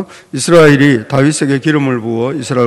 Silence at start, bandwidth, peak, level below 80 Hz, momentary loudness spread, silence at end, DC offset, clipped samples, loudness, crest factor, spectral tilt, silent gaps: 0 s; 13 kHz; 0 dBFS; -48 dBFS; 10 LU; 0 s; under 0.1%; 2%; -11 LUFS; 10 dB; -5.5 dB/octave; none